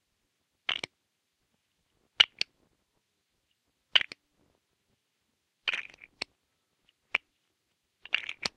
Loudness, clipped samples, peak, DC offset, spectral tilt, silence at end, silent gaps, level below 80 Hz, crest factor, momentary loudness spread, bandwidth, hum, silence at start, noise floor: -29 LUFS; under 0.1%; -2 dBFS; under 0.1%; 0.5 dB/octave; 0.1 s; none; -76 dBFS; 36 dB; 17 LU; 13.5 kHz; none; 0.7 s; -79 dBFS